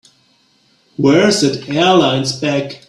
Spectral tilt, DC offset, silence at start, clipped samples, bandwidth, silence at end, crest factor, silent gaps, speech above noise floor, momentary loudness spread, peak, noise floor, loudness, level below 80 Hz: -4.5 dB/octave; under 0.1%; 1 s; under 0.1%; 12.5 kHz; 0.15 s; 14 dB; none; 42 dB; 7 LU; 0 dBFS; -56 dBFS; -13 LUFS; -54 dBFS